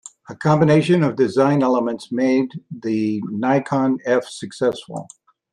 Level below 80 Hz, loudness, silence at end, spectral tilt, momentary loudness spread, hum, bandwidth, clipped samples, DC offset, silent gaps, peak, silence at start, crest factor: -62 dBFS; -19 LUFS; 0.5 s; -7 dB/octave; 15 LU; none; 11 kHz; under 0.1%; under 0.1%; none; -4 dBFS; 0.3 s; 16 dB